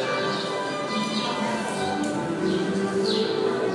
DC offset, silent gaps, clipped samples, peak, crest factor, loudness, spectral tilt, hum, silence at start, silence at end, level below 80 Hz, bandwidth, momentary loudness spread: under 0.1%; none; under 0.1%; -12 dBFS; 12 dB; -26 LUFS; -4.5 dB/octave; none; 0 s; 0 s; -66 dBFS; 11.5 kHz; 3 LU